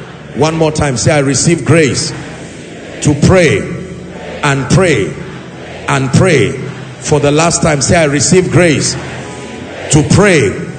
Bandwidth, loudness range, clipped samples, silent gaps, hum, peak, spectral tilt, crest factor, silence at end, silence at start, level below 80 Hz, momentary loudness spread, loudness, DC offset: 9.4 kHz; 3 LU; 0.4%; none; none; 0 dBFS; -5 dB/octave; 12 dB; 0 s; 0 s; -36 dBFS; 17 LU; -10 LUFS; under 0.1%